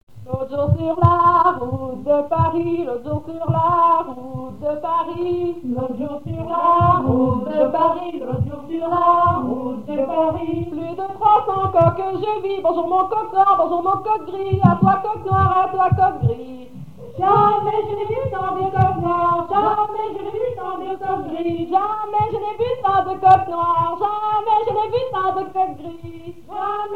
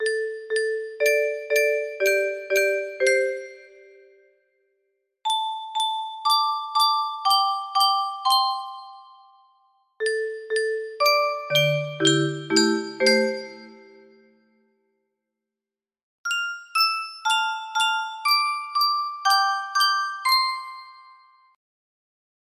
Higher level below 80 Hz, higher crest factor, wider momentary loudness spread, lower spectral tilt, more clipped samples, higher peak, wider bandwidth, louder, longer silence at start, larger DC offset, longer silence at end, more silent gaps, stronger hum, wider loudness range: first, -46 dBFS vs -76 dBFS; about the same, 18 dB vs 20 dB; first, 12 LU vs 8 LU; first, -9 dB/octave vs -2.5 dB/octave; neither; first, 0 dBFS vs -6 dBFS; second, 7.6 kHz vs 15.5 kHz; first, -19 LUFS vs -22 LUFS; about the same, 0 s vs 0 s; first, 0.9% vs under 0.1%; second, 0 s vs 1.5 s; second, 0.03-0.07 s vs 16.03-16.24 s; neither; second, 3 LU vs 6 LU